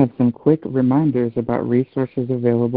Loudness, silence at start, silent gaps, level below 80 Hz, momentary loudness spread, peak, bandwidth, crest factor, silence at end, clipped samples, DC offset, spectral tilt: -19 LUFS; 0 s; none; -54 dBFS; 5 LU; -2 dBFS; 4.4 kHz; 16 dB; 0 s; under 0.1%; under 0.1%; -14 dB/octave